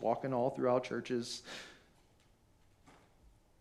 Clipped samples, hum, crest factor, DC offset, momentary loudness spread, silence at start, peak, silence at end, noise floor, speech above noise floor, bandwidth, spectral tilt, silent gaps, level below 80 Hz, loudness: under 0.1%; none; 20 dB; under 0.1%; 15 LU; 0 s; -18 dBFS; 0.7 s; -68 dBFS; 32 dB; 13.5 kHz; -5.5 dB/octave; none; -72 dBFS; -36 LUFS